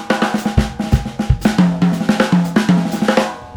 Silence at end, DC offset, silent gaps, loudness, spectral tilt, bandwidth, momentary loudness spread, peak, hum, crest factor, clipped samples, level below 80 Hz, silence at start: 0 s; under 0.1%; none; -16 LUFS; -6.5 dB/octave; 20 kHz; 4 LU; 0 dBFS; none; 14 dB; under 0.1%; -26 dBFS; 0 s